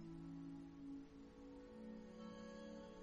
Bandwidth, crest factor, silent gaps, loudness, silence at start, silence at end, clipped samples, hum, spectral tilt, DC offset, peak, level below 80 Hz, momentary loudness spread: 9.6 kHz; 12 dB; none; -56 LUFS; 0 s; 0 s; under 0.1%; none; -7 dB/octave; under 0.1%; -44 dBFS; -70 dBFS; 5 LU